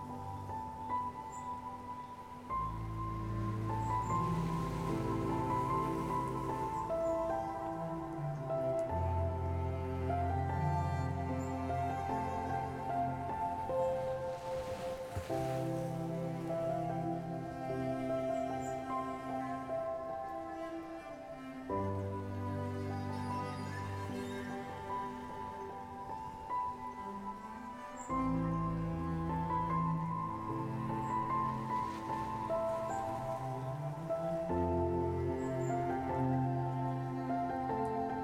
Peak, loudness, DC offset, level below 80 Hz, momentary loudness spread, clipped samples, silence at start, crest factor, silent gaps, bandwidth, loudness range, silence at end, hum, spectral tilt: -22 dBFS; -38 LUFS; under 0.1%; -56 dBFS; 9 LU; under 0.1%; 0 s; 16 dB; none; 16 kHz; 5 LU; 0 s; none; -7.5 dB/octave